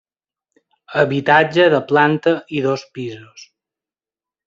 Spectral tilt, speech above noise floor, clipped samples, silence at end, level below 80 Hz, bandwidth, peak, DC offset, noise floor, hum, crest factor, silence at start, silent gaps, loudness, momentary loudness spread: -6.5 dB/octave; over 74 dB; under 0.1%; 1.2 s; -62 dBFS; 7.6 kHz; -2 dBFS; under 0.1%; under -90 dBFS; none; 18 dB; 0.9 s; none; -16 LUFS; 16 LU